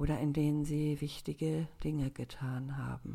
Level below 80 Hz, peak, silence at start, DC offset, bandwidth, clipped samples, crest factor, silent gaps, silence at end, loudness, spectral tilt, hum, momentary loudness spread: -48 dBFS; -20 dBFS; 0 s; under 0.1%; 15 kHz; under 0.1%; 14 dB; none; 0 s; -36 LUFS; -7.5 dB/octave; none; 8 LU